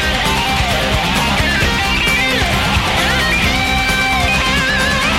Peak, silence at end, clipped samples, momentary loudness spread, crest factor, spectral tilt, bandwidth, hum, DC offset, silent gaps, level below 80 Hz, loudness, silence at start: 0 dBFS; 0 s; under 0.1%; 2 LU; 14 dB; -3.5 dB/octave; 16.5 kHz; none; under 0.1%; none; -24 dBFS; -13 LUFS; 0 s